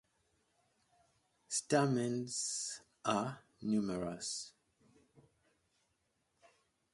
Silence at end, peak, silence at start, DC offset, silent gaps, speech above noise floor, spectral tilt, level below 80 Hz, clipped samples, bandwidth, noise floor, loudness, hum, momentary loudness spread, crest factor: 2.45 s; -18 dBFS; 1.5 s; under 0.1%; none; 45 dB; -4 dB/octave; -74 dBFS; under 0.1%; 11.5 kHz; -81 dBFS; -37 LUFS; none; 11 LU; 22 dB